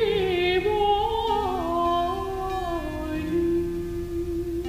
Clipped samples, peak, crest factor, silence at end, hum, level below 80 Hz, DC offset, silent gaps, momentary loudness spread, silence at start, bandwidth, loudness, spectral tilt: under 0.1%; -10 dBFS; 14 dB; 0 s; none; -38 dBFS; under 0.1%; none; 8 LU; 0 s; 15.5 kHz; -25 LUFS; -6 dB/octave